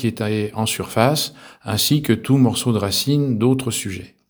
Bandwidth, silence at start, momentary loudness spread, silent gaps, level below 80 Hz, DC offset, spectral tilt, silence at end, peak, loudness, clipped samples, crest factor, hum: over 20 kHz; 0 s; 8 LU; none; -54 dBFS; under 0.1%; -5 dB/octave; 0.25 s; 0 dBFS; -19 LUFS; under 0.1%; 20 dB; none